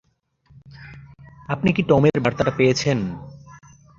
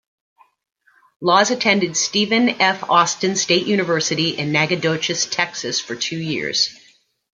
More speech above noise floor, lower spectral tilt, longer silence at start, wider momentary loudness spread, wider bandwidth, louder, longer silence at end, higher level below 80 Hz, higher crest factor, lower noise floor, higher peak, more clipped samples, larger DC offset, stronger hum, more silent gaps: first, 41 dB vs 36 dB; first, -6 dB/octave vs -3 dB/octave; second, 0.8 s vs 1.2 s; first, 25 LU vs 7 LU; second, 7.6 kHz vs 10 kHz; about the same, -20 LUFS vs -18 LUFS; second, 0.4 s vs 0.6 s; first, -48 dBFS vs -64 dBFS; about the same, 20 dB vs 18 dB; first, -60 dBFS vs -55 dBFS; about the same, -2 dBFS vs 0 dBFS; neither; neither; neither; neither